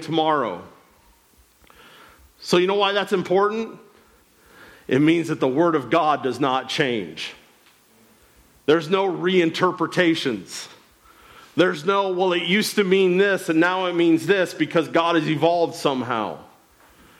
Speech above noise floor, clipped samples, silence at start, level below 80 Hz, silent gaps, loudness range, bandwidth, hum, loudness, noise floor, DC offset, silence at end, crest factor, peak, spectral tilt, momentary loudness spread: 36 dB; under 0.1%; 0 s; -66 dBFS; none; 4 LU; 15.5 kHz; none; -21 LUFS; -57 dBFS; under 0.1%; 0.75 s; 16 dB; -6 dBFS; -5 dB/octave; 12 LU